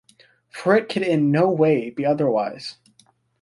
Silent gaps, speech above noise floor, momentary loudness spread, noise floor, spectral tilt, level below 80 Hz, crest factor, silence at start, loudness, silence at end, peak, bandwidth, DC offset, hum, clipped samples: none; 40 dB; 15 LU; -59 dBFS; -7.5 dB/octave; -66 dBFS; 18 dB; 0.55 s; -20 LUFS; 0.7 s; -4 dBFS; 11.5 kHz; under 0.1%; none; under 0.1%